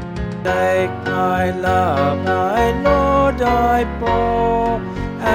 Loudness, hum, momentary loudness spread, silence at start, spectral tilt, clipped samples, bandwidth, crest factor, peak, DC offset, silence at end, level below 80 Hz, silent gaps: -17 LUFS; none; 6 LU; 0 s; -6.5 dB/octave; under 0.1%; 16.5 kHz; 14 dB; -2 dBFS; 0.2%; 0 s; -30 dBFS; none